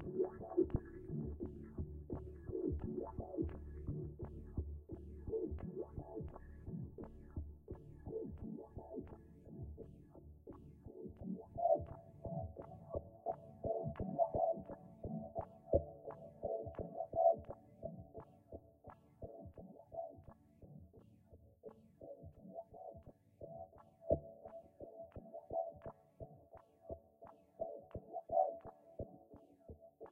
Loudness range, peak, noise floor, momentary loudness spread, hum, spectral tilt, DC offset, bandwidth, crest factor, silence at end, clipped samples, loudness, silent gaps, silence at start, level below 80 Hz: 14 LU; -18 dBFS; -65 dBFS; 21 LU; none; -8 dB/octave; under 0.1%; 3.1 kHz; 26 dB; 0 s; under 0.1%; -45 LUFS; none; 0 s; -58 dBFS